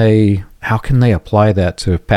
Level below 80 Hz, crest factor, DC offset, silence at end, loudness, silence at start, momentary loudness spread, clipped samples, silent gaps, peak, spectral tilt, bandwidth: -30 dBFS; 12 dB; under 0.1%; 0 s; -14 LUFS; 0 s; 7 LU; under 0.1%; none; 0 dBFS; -7.5 dB/octave; 11 kHz